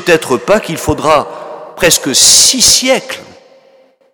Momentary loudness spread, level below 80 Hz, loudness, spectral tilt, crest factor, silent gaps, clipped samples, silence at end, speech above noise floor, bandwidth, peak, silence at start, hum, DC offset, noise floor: 21 LU; -38 dBFS; -8 LUFS; -1.5 dB/octave; 12 dB; none; 0.6%; 0.9 s; 37 dB; over 20 kHz; 0 dBFS; 0 s; none; under 0.1%; -47 dBFS